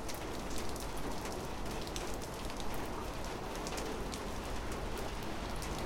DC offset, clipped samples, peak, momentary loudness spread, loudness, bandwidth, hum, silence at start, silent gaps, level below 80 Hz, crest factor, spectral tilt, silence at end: under 0.1%; under 0.1%; -20 dBFS; 2 LU; -41 LUFS; 17 kHz; none; 0 s; none; -46 dBFS; 18 dB; -4 dB/octave; 0 s